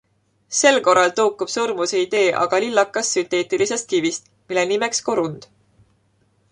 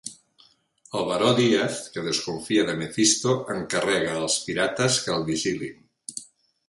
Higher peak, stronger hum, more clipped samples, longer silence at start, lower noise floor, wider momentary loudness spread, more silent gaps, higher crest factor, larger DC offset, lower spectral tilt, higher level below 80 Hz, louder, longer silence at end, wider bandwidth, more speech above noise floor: first, -2 dBFS vs -6 dBFS; neither; neither; first, 0.5 s vs 0.05 s; about the same, -62 dBFS vs -60 dBFS; second, 9 LU vs 17 LU; neither; about the same, 18 dB vs 20 dB; neither; about the same, -2.5 dB/octave vs -3.5 dB/octave; second, -66 dBFS vs -60 dBFS; first, -19 LUFS vs -24 LUFS; first, 1.1 s vs 0.45 s; about the same, 11 kHz vs 11.5 kHz; first, 43 dB vs 36 dB